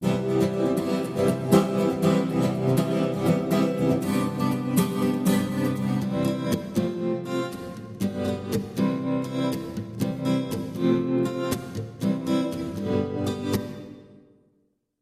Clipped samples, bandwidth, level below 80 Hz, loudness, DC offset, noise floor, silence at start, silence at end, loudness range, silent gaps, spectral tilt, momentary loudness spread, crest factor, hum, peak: under 0.1%; 15.5 kHz; -56 dBFS; -25 LUFS; under 0.1%; -69 dBFS; 0 s; 1 s; 5 LU; none; -7 dB/octave; 7 LU; 20 dB; none; -6 dBFS